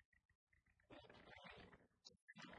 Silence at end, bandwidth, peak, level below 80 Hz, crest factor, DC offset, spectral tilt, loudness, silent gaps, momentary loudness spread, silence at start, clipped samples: 0 s; 10 kHz; -44 dBFS; -82 dBFS; 22 dB; under 0.1%; -4 dB/octave; -64 LUFS; 0.05-0.12 s, 0.25-0.29 s, 0.35-0.47 s, 2.22-2.27 s; 6 LU; 0 s; under 0.1%